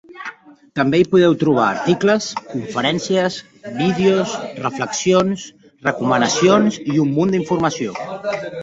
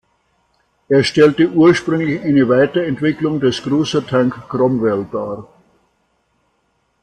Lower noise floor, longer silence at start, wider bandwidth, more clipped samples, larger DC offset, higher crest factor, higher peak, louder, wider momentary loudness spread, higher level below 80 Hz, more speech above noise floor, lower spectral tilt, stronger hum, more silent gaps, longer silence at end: second, -37 dBFS vs -64 dBFS; second, 0.1 s vs 0.9 s; second, 8 kHz vs 9.8 kHz; neither; neither; about the same, 16 dB vs 14 dB; about the same, -2 dBFS vs -2 dBFS; second, -18 LUFS vs -15 LUFS; first, 13 LU vs 8 LU; about the same, -56 dBFS vs -54 dBFS; second, 20 dB vs 50 dB; second, -5 dB/octave vs -6.5 dB/octave; neither; neither; second, 0 s vs 1.6 s